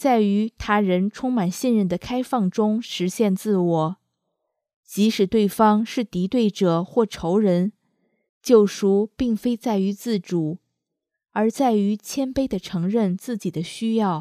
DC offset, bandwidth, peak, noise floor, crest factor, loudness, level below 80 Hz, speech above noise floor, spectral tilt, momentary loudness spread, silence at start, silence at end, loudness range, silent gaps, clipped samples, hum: under 0.1%; 15.5 kHz; -2 dBFS; -82 dBFS; 20 dB; -22 LUFS; -52 dBFS; 61 dB; -6.5 dB/octave; 9 LU; 0 s; 0 s; 3 LU; 4.76-4.83 s, 8.29-8.41 s; under 0.1%; none